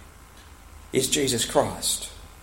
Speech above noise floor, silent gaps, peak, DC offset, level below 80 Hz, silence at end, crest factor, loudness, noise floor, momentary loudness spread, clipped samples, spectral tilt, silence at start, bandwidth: 23 dB; none; -6 dBFS; under 0.1%; -48 dBFS; 0 s; 22 dB; -24 LUFS; -48 dBFS; 7 LU; under 0.1%; -2.5 dB/octave; 0 s; 16.5 kHz